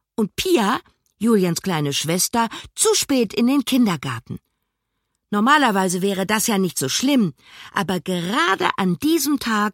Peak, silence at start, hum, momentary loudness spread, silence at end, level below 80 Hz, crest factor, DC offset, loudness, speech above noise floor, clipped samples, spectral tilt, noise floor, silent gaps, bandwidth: 0 dBFS; 0.2 s; none; 9 LU; 0 s; -56 dBFS; 20 dB; under 0.1%; -20 LUFS; 56 dB; under 0.1%; -4 dB/octave; -76 dBFS; none; 16.5 kHz